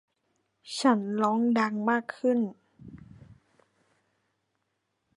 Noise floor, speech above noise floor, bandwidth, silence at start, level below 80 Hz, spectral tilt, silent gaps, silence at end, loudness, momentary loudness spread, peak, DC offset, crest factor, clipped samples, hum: -79 dBFS; 53 dB; 11.5 kHz; 0.65 s; -70 dBFS; -5.5 dB/octave; none; 2.15 s; -27 LUFS; 10 LU; -10 dBFS; under 0.1%; 22 dB; under 0.1%; none